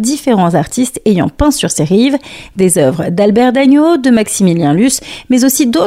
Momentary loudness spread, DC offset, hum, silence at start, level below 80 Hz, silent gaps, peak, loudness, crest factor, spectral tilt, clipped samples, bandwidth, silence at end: 6 LU; under 0.1%; none; 0 s; -34 dBFS; none; 0 dBFS; -11 LUFS; 10 dB; -5 dB/octave; under 0.1%; 16 kHz; 0 s